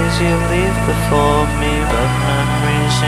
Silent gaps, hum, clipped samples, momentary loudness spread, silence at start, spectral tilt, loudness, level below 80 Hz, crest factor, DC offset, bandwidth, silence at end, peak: none; none; under 0.1%; 2 LU; 0 s; -5.5 dB/octave; -15 LUFS; -24 dBFS; 14 dB; under 0.1%; 15.5 kHz; 0 s; 0 dBFS